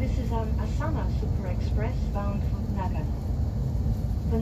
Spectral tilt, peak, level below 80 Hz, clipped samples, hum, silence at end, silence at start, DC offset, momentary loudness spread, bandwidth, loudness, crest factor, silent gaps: -8.5 dB/octave; -14 dBFS; -30 dBFS; under 0.1%; none; 0 s; 0 s; under 0.1%; 1 LU; 14 kHz; -29 LUFS; 12 dB; none